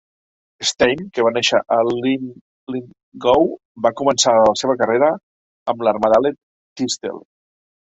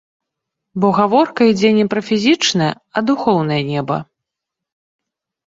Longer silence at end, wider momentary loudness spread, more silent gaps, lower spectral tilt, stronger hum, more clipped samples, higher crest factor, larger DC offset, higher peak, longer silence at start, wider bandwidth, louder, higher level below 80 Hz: second, 0.7 s vs 1.55 s; first, 15 LU vs 8 LU; first, 2.41-2.67 s, 3.03-3.12 s, 3.65-3.75 s, 5.23-5.66 s, 6.43-6.76 s vs none; second, -3 dB/octave vs -5 dB/octave; neither; neither; about the same, 18 dB vs 16 dB; neither; about the same, 0 dBFS vs -2 dBFS; second, 0.6 s vs 0.75 s; about the same, 8.4 kHz vs 7.8 kHz; about the same, -17 LUFS vs -15 LUFS; about the same, -56 dBFS vs -58 dBFS